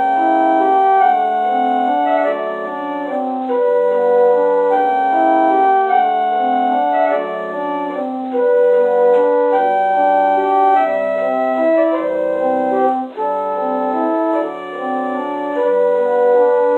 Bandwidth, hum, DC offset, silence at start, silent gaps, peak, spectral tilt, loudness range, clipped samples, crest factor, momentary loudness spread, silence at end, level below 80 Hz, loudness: 4.2 kHz; none; under 0.1%; 0 s; none; -2 dBFS; -6.5 dB/octave; 4 LU; under 0.1%; 12 dB; 8 LU; 0 s; -64 dBFS; -15 LUFS